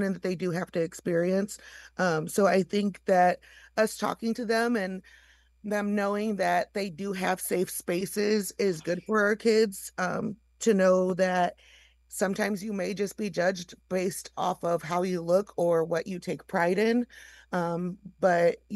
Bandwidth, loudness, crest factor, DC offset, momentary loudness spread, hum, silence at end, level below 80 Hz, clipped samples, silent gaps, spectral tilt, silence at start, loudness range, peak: 12.5 kHz; -28 LUFS; 18 dB; under 0.1%; 10 LU; none; 0 s; -64 dBFS; under 0.1%; none; -5 dB/octave; 0 s; 3 LU; -10 dBFS